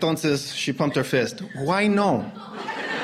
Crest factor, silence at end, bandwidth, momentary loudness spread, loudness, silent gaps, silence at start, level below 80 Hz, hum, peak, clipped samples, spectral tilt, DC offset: 16 dB; 0 s; 15 kHz; 11 LU; -24 LUFS; none; 0 s; -60 dBFS; none; -8 dBFS; under 0.1%; -5 dB/octave; under 0.1%